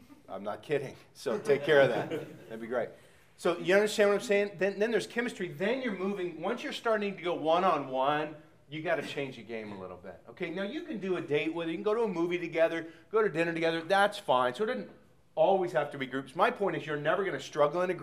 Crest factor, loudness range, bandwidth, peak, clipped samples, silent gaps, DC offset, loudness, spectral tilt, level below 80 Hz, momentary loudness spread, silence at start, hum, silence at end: 20 dB; 5 LU; 15.5 kHz; -10 dBFS; under 0.1%; none; under 0.1%; -31 LUFS; -5 dB/octave; -74 dBFS; 14 LU; 0.1 s; none; 0 s